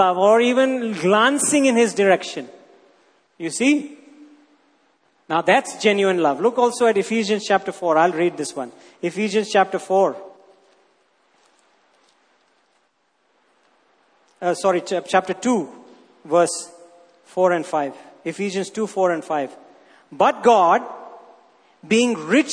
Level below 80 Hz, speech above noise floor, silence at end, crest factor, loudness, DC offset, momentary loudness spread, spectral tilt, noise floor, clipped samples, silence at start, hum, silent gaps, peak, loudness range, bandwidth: -72 dBFS; 47 dB; 0 s; 20 dB; -19 LUFS; under 0.1%; 15 LU; -4 dB/octave; -66 dBFS; under 0.1%; 0 s; none; none; -2 dBFS; 6 LU; 11 kHz